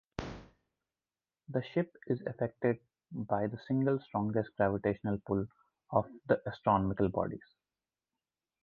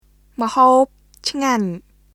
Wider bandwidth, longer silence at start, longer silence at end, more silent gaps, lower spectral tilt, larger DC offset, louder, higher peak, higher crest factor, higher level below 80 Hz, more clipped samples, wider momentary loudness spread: second, 7 kHz vs 14.5 kHz; second, 0.2 s vs 0.4 s; first, 1.25 s vs 0.35 s; neither; first, -9 dB/octave vs -4.5 dB/octave; neither; second, -34 LUFS vs -18 LUFS; second, -14 dBFS vs -2 dBFS; first, 22 dB vs 16 dB; about the same, -58 dBFS vs -54 dBFS; neither; second, 13 LU vs 16 LU